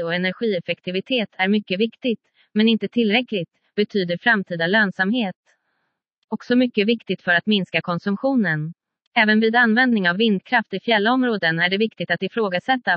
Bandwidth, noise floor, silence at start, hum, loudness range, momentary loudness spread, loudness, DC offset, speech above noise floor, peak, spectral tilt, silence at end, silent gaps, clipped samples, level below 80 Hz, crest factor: 5.8 kHz; -74 dBFS; 0 s; none; 4 LU; 9 LU; -20 LUFS; under 0.1%; 54 dB; -2 dBFS; -7.5 dB/octave; 0 s; 5.36-5.44 s, 6.17-6.28 s, 9.07-9.12 s; under 0.1%; -72 dBFS; 18 dB